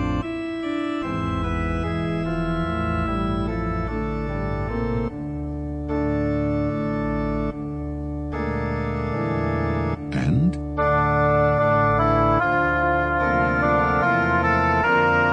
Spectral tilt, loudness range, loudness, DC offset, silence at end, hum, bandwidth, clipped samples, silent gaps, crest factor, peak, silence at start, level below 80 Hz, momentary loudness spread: -8.5 dB/octave; 6 LU; -22 LUFS; under 0.1%; 0 s; none; 9.2 kHz; under 0.1%; none; 14 dB; -8 dBFS; 0 s; -34 dBFS; 9 LU